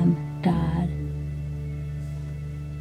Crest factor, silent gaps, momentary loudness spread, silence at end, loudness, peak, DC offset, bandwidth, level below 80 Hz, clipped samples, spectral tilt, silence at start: 16 dB; none; 10 LU; 0 s; -29 LUFS; -10 dBFS; under 0.1%; 9.2 kHz; -38 dBFS; under 0.1%; -9 dB/octave; 0 s